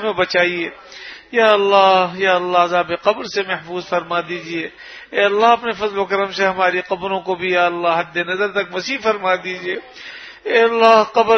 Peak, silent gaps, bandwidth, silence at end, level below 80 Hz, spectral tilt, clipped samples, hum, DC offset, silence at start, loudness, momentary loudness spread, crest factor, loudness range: 0 dBFS; none; 6.6 kHz; 0 s; -58 dBFS; -4 dB/octave; under 0.1%; none; under 0.1%; 0 s; -17 LUFS; 14 LU; 18 dB; 3 LU